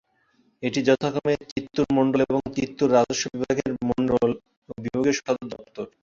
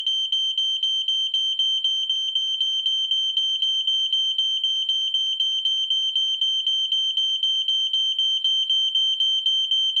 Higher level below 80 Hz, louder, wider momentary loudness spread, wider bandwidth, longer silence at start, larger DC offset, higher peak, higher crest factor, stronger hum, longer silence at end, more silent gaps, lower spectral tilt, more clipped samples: first, -54 dBFS vs -84 dBFS; second, -24 LUFS vs -20 LUFS; first, 13 LU vs 2 LU; second, 7.6 kHz vs 10 kHz; first, 0.6 s vs 0 s; neither; first, -6 dBFS vs -12 dBFS; first, 18 dB vs 10 dB; neither; first, 0.15 s vs 0 s; first, 1.52-1.56 s, 4.57-4.62 s vs none; first, -5 dB/octave vs 8 dB/octave; neither